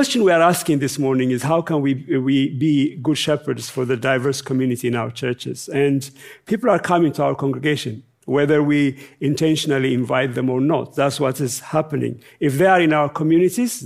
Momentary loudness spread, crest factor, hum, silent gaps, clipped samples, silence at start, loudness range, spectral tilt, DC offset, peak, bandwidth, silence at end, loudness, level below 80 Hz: 9 LU; 16 dB; none; none; under 0.1%; 0 s; 2 LU; -5.5 dB/octave; under 0.1%; -2 dBFS; 16 kHz; 0 s; -19 LUFS; -64 dBFS